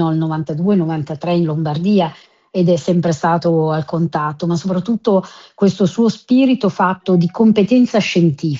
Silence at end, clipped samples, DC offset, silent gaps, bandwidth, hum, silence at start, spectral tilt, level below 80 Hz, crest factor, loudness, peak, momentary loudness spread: 0 s; under 0.1%; under 0.1%; none; 7.6 kHz; none; 0 s; -7.5 dB/octave; -56 dBFS; 14 dB; -16 LUFS; 0 dBFS; 6 LU